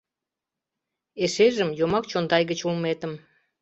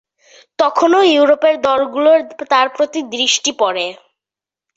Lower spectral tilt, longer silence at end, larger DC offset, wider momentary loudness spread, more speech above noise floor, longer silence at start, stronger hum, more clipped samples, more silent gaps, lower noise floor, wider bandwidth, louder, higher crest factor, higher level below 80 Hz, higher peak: first, -5 dB/octave vs -1 dB/octave; second, 0.45 s vs 0.8 s; neither; first, 14 LU vs 8 LU; second, 64 dB vs 75 dB; first, 1.15 s vs 0.6 s; neither; neither; neither; about the same, -88 dBFS vs -88 dBFS; about the same, 8.2 kHz vs 8 kHz; second, -24 LUFS vs -14 LUFS; first, 20 dB vs 14 dB; about the same, -62 dBFS vs -64 dBFS; second, -6 dBFS vs 0 dBFS